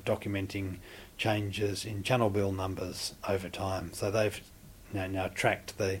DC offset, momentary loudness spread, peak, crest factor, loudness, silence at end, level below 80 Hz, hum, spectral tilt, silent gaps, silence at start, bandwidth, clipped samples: under 0.1%; 10 LU; -10 dBFS; 22 dB; -33 LUFS; 0 s; -56 dBFS; none; -5 dB/octave; none; 0 s; 16.5 kHz; under 0.1%